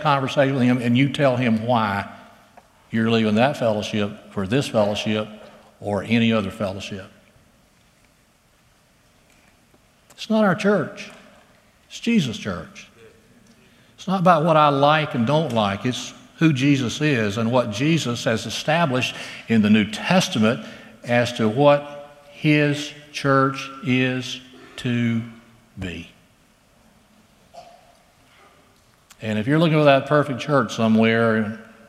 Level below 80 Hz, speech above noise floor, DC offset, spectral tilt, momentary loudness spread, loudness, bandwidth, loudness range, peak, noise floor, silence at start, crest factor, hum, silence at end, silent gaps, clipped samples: -60 dBFS; 39 dB; under 0.1%; -6 dB/octave; 16 LU; -20 LUFS; 14 kHz; 10 LU; 0 dBFS; -58 dBFS; 0 s; 22 dB; none; 0.25 s; none; under 0.1%